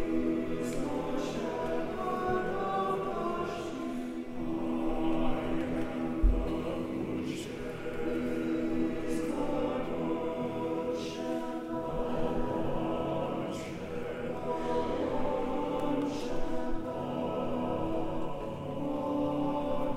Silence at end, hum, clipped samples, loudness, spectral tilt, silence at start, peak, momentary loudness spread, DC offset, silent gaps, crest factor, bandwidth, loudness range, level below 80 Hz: 0 s; none; under 0.1%; -34 LUFS; -6.5 dB/octave; 0 s; -14 dBFS; 5 LU; under 0.1%; none; 18 dB; 13.5 kHz; 1 LU; -42 dBFS